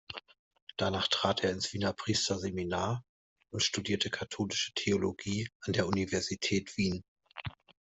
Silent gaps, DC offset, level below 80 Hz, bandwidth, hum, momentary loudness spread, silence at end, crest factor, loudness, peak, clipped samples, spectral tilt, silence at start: 0.39-0.51 s, 0.62-0.67 s, 3.09-3.36 s, 5.55-5.60 s, 7.08-7.16 s; under 0.1%; -64 dBFS; 8.2 kHz; none; 14 LU; 0.35 s; 20 dB; -32 LUFS; -14 dBFS; under 0.1%; -4 dB/octave; 0.1 s